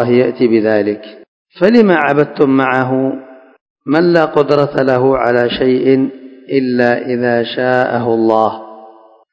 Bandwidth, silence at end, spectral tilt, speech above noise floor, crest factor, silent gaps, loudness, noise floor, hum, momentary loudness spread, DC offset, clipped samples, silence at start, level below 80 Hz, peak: 8 kHz; 0.4 s; -8 dB/octave; 29 dB; 12 dB; 1.28-1.45 s, 3.61-3.76 s; -13 LUFS; -41 dBFS; none; 7 LU; under 0.1%; 0.4%; 0 s; -52 dBFS; 0 dBFS